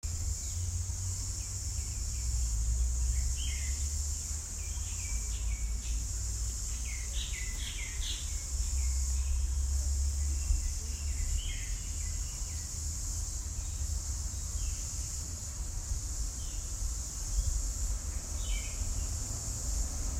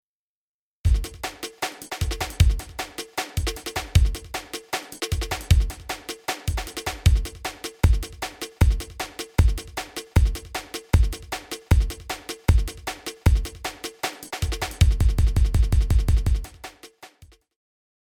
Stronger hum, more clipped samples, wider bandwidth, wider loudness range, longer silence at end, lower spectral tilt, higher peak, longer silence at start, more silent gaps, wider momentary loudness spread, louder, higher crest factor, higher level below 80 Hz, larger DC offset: neither; neither; second, 16 kHz vs 19 kHz; about the same, 3 LU vs 3 LU; second, 0 s vs 0.95 s; second, -2.5 dB/octave vs -5 dB/octave; second, -18 dBFS vs -6 dBFS; second, 0.05 s vs 0.85 s; neither; second, 4 LU vs 11 LU; second, -36 LUFS vs -25 LUFS; about the same, 16 dB vs 18 dB; second, -36 dBFS vs -26 dBFS; neither